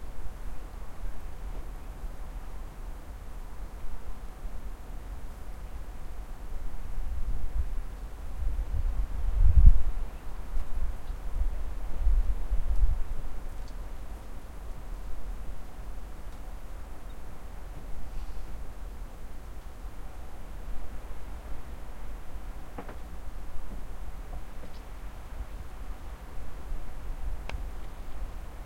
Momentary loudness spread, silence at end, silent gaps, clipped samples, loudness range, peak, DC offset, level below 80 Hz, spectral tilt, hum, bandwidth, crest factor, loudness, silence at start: 12 LU; 0 s; none; under 0.1%; 15 LU; -4 dBFS; under 0.1%; -32 dBFS; -6.5 dB/octave; none; 8.6 kHz; 24 dB; -38 LUFS; 0 s